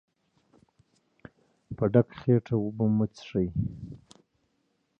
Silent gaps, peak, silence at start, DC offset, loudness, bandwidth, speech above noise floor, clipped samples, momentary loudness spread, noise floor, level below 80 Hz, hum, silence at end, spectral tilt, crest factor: none; -8 dBFS; 1.7 s; under 0.1%; -28 LUFS; 7 kHz; 48 dB; under 0.1%; 20 LU; -74 dBFS; -54 dBFS; none; 1.05 s; -9.5 dB/octave; 22 dB